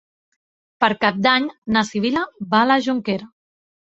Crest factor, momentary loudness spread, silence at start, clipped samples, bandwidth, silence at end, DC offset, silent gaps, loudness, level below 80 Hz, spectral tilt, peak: 20 dB; 8 LU; 0.8 s; under 0.1%; 8 kHz; 0.6 s; under 0.1%; 1.58-1.62 s; -19 LUFS; -58 dBFS; -5 dB/octave; 0 dBFS